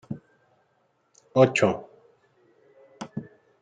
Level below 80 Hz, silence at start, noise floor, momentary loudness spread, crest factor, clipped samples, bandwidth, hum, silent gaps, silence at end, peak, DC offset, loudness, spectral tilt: -68 dBFS; 0.1 s; -69 dBFS; 21 LU; 24 dB; under 0.1%; 9.4 kHz; none; none; 0.4 s; -4 dBFS; under 0.1%; -24 LUFS; -6 dB/octave